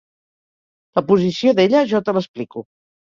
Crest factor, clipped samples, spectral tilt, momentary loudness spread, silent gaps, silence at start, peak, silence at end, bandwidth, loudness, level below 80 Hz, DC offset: 16 dB; under 0.1%; -6.5 dB/octave; 15 LU; 2.28-2.34 s; 0.95 s; -2 dBFS; 0.45 s; 7.4 kHz; -17 LUFS; -60 dBFS; under 0.1%